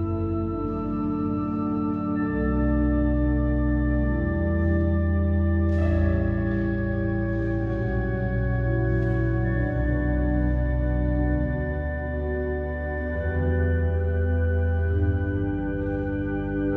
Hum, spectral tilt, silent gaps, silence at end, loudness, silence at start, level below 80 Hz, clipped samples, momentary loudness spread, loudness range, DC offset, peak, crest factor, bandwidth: none; -11 dB/octave; none; 0 s; -25 LUFS; 0 s; -30 dBFS; under 0.1%; 5 LU; 3 LU; under 0.1%; -12 dBFS; 12 dB; 4 kHz